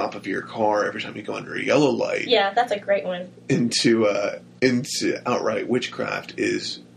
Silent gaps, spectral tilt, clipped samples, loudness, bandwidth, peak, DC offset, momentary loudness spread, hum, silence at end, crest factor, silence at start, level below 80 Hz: none; -4 dB/octave; under 0.1%; -23 LUFS; 13 kHz; -4 dBFS; under 0.1%; 10 LU; none; 0.15 s; 18 dB; 0 s; -64 dBFS